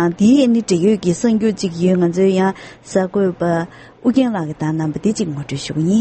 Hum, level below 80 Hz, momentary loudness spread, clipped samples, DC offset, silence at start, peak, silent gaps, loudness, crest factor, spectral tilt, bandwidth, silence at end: none; -50 dBFS; 9 LU; under 0.1%; under 0.1%; 0 s; -2 dBFS; none; -17 LUFS; 14 dB; -6.5 dB/octave; 8.8 kHz; 0 s